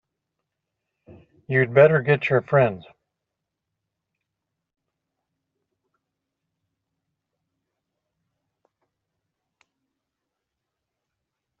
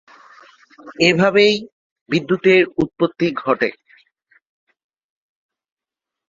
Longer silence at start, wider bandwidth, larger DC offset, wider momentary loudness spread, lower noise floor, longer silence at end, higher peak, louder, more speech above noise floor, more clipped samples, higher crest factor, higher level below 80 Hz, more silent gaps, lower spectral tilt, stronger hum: first, 1.5 s vs 0.85 s; second, 6.6 kHz vs 7.6 kHz; neither; about the same, 8 LU vs 9 LU; about the same, -84 dBFS vs -86 dBFS; first, 8.8 s vs 2.6 s; about the same, -2 dBFS vs -2 dBFS; about the same, -19 LUFS vs -17 LUFS; second, 65 dB vs 70 dB; neither; about the same, 24 dB vs 20 dB; second, -68 dBFS vs -58 dBFS; second, none vs 1.72-2.06 s; about the same, -6 dB/octave vs -5.5 dB/octave; neither